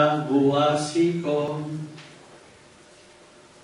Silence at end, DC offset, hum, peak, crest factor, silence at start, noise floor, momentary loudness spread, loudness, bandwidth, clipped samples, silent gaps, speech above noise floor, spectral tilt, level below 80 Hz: 1.25 s; under 0.1%; none; -8 dBFS; 18 dB; 0 s; -51 dBFS; 16 LU; -23 LUFS; 11.5 kHz; under 0.1%; none; 28 dB; -6 dB/octave; -68 dBFS